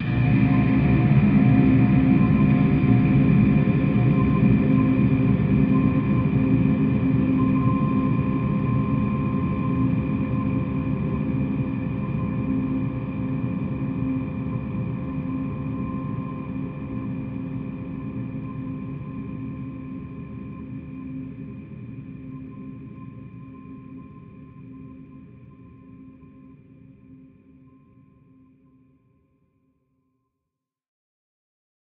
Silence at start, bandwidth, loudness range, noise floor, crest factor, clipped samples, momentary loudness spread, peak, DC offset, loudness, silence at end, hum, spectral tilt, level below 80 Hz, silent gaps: 0 s; 4.7 kHz; 21 LU; -84 dBFS; 18 dB; under 0.1%; 20 LU; -6 dBFS; under 0.1%; -22 LUFS; 4.85 s; none; -9.5 dB/octave; -40 dBFS; none